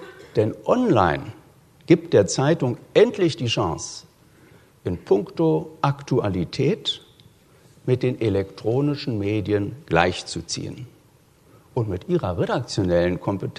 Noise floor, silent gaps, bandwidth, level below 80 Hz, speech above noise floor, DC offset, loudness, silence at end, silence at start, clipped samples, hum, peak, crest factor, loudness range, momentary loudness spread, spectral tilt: -55 dBFS; none; 13 kHz; -50 dBFS; 34 dB; under 0.1%; -22 LUFS; 0.05 s; 0 s; under 0.1%; none; 0 dBFS; 22 dB; 5 LU; 12 LU; -6 dB/octave